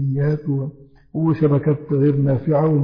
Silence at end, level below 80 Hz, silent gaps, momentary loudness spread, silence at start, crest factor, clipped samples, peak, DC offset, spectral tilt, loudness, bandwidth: 0 s; -52 dBFS; none; 8 LU; 0 s; 12 dB; under 0.1%; -6 dBFS; under 0.1%; -12.5 dB/octave; -19 LUFS; 5.2 kHz